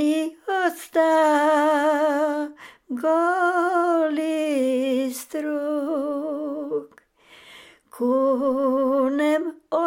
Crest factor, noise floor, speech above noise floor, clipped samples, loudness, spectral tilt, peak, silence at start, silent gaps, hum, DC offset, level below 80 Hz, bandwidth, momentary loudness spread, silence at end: 14 dB; -53 dBFS; 33 dB; under 0.1%; -22 LUFS; -3.5 dB/octave; -8 dBFS; 0 s; none; none; under 0.1%; -74 dBFS; 17 kHz; 10 LU; 0 s